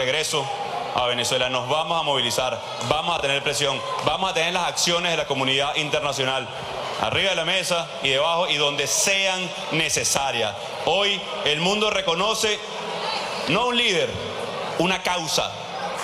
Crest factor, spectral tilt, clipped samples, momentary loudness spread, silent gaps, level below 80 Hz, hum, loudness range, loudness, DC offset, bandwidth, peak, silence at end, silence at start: 20 dB; -2 dB/octave; under 0.1%; 7 LU; none; -54 dBFS; none; 2 LU; -22 LUFS; under 0.1%; 16 kHz; -4 dBFS; 0 s; 0 s